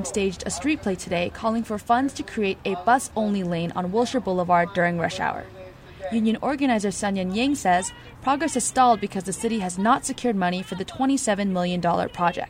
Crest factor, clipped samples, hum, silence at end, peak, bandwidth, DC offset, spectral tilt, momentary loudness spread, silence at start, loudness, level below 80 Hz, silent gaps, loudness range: 18 dB; under 0.1%; none; 0 s; -6 dBFS; 16 kHz; under 0.1%; -4.5 dB/octave; 7 LU; 0 s; -24 LUFS; -50 dBFS; none; 2 LU